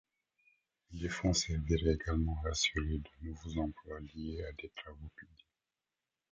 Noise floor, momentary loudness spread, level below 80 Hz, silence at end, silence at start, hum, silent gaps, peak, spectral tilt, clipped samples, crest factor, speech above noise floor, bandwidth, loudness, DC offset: under -90 dBFS; 17 LU; -44 dBFS; 1.1 s; 0.9 s; none; none; -18 dBFS; -4.5 dB/octave; under 0.1%; 20 dB; over 53 dB; 9.2 kHz; -36 LUFS; under 0.1%